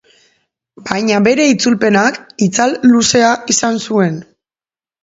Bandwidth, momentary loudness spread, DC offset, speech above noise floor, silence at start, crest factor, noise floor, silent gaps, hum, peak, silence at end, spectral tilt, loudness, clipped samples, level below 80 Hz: 8 kHz; 8 LU; under 0.1%; over 78 dB; 0.8 s; 14 dB; under -90 dBFS; none; none; 0 dBFS; 0.8 s; -4 dB/octave; -12 LUFS; under 0.1%; -54 dBFS